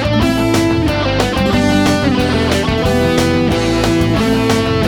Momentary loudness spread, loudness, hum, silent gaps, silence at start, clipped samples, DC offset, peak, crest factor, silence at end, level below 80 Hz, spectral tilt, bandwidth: 2 LU; -13 LUFS; none; none; 0 s; under 0.1%; under 0.1%; 0 dBFS; 12 dB; 0 s; -26 dBFS; -5.5 dB/octave; 19.5 kHz